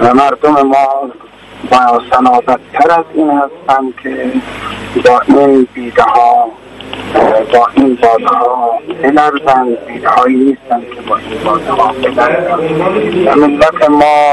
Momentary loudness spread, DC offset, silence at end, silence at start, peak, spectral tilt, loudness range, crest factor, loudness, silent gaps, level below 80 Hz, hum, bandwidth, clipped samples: 10 LU; under 0.1%; 0 s; 0 s; 0 dBFS; -6 dB/octave; 2 LU; 10 dB; -10 LUFS; none; -42 dBFS; none; 11.5 kHz; 0.7%